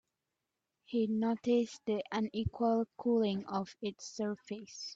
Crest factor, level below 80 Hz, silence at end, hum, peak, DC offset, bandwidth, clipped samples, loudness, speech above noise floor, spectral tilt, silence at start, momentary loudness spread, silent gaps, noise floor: 14 dB; -62 dBFS; 0 s; none; -20 dBFS; under 0.1%; 7.8 kHz; under 0.1%; -35 LUFS; 54 dB; -6 dB/octave; 0.9 s; 10 LU; none; -88 dBFS